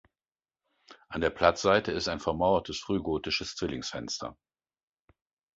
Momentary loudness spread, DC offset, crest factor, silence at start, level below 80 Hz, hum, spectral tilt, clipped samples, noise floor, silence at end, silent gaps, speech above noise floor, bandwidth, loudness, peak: 11 LU; under 0.1%; 26 dB; 0.9 s; -52 dBFS; none; -4 dB/octave; under 0.1%; under -90 dBFS; 1.25 s; none; over 61 dB; 8 kHz; -29 LUFS; -6 dBFS